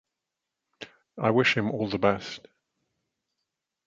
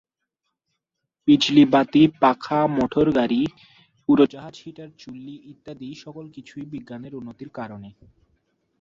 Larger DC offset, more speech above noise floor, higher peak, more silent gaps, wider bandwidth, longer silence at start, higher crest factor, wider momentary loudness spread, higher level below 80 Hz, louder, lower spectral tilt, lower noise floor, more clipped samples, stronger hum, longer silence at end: neither; about the same, 60 dB vs 59 dB; about the same, -6 dBFS vs -4 dBFS; neither; about the same, 7.8 kHz vs 7.4 kHz; second, 0.8 s vs 1.25 s; about the same, 24 dB vs 20 dB; about the same, 23 LU vs 24 LU; about the same, -62 dBFS vs -58 dBFS; second, -25 LUFS vs -19 LUFS; about the same, -6 dB/octave vs -6.5 dB/octave; first, -86 dBFS vs -81 dBFS; neither; neither; first, 1.5 s vs 0.95 s